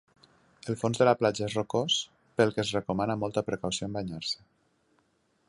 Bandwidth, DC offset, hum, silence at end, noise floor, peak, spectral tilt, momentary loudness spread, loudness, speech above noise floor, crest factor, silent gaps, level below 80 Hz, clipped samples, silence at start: 11.5 kHz; under 0.1%; none; 1.15 s; -71 dBFS; -8 dBFS; -4.5 dB/octave; 10 LU; -29 LUFS; 42 dB; 22 dB; none; -60 dBFS; under 0.1%; 0.65 s